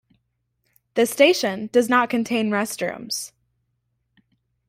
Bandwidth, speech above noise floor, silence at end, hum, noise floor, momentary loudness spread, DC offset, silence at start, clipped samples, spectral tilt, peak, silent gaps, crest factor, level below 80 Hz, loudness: 16 kHz; 52 dB; 1.4 s; none; -73 dBFS; 12 LU; under 0.1%; 0.95 s; under 0.1%; -3.5 dB/octave; -2 dBFS; none; 20 dB; -68 dBFS; -21 LUFS